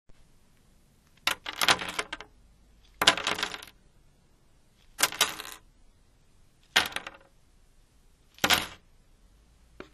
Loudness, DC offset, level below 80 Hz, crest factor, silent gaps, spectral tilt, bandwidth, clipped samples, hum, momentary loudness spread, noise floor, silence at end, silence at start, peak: -27 LUFS; under 0.1%; -60 dBFS; 34 dB; none; -0.5 dB/octave; 14 kHz; under 0.1%; none; 19 LU; -61 dBFS; 0.1 s; 0.1 s; 0 dBFS